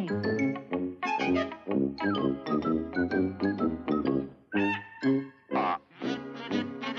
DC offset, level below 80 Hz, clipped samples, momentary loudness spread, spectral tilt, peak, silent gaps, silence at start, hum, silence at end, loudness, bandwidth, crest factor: under 0.1%; -60 dBFS; under 0.1%; 5 LU; -7 dB/octave; -16 dBFS; none; 0 s; none; 0 s; -30 LUFS; 7.4 kHz; 14 dB